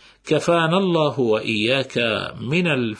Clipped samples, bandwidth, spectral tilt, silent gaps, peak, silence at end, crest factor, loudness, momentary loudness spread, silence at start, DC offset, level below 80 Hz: under 0.1%; 10.5 kHz; -5.5 dB/octave; none; -4 dBFS; 0 s; 16 dB; -20 LUFS; 5 LU; 0.25 s; under 0.1%; -58 dBFS